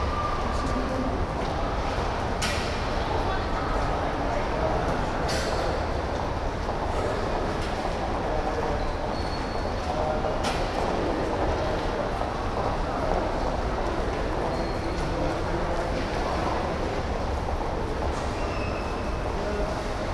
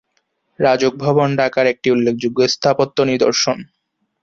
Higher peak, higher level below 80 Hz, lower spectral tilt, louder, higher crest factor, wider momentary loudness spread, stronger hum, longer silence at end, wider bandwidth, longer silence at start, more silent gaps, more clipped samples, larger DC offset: second, -8 dBFS vs -2 dBFS; first, -32 dBFS vs -56 dBFS; about the same, -5.5 dB/octave vs -4.5 dB/octave; second, -28 LUFS vs -16 LUFS; about the same, 18 dB vs 14 dB; about the same, 3 LU vs 3 LU; neither; second, 0 s vs 0.6 s; first, 12 kHz vs 7.6 kHz; second, 0 s vs 0.6 s; neither; neither; neither